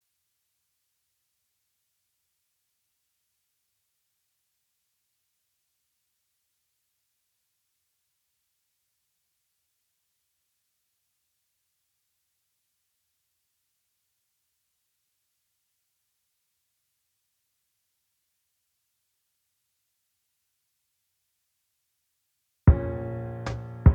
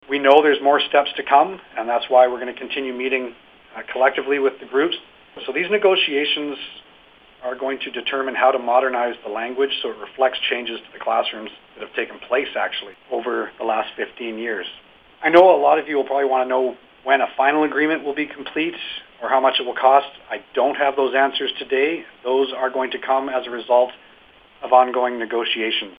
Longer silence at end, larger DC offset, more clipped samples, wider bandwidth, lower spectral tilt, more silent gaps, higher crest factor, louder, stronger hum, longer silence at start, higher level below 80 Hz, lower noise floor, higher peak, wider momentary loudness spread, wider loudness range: about the same, 0 s vs 0.05 s; neither; neither; first, 6.8 kHz vs 5.2 kHz; first, -9.5 dB/octave vs -5.5 dB/octave; neither; first, 30 dB vs 20 dB; second, -26 LUFS vs -20 LUFS; neither; first, 22.65 s vs 0.1 s; first, -40 dBFS vs -66 dBFS; first, -78 dBFS vs -50 dBFS; second, -4 dBFS vs 0 dBFS; about the same, 13 LU vs 13 LU; second, 2 LU vs 6 LU